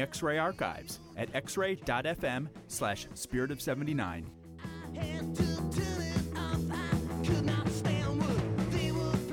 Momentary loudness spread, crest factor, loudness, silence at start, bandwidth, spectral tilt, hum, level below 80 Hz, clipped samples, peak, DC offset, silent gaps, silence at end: 8 LU; 16 dB; -34 LUFS; 0 s; 18 kHz; -5.5 dB/octave; none; -48 dBFS; under 0.1%; -16 dBFS; under 0.1%; none; 0 s